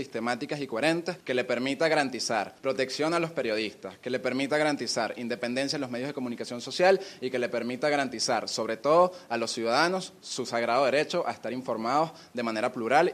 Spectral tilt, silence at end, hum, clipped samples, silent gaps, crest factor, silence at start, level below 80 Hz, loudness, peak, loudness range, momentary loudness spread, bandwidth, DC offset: -4 dB/octave; 0 s; none; under 0.1%; none; 20 dB; 0 s; -74 dBFS; -28 LUFS; -8 dBFS; 2 LU; 9 LU; 15 kHz; under 0.1%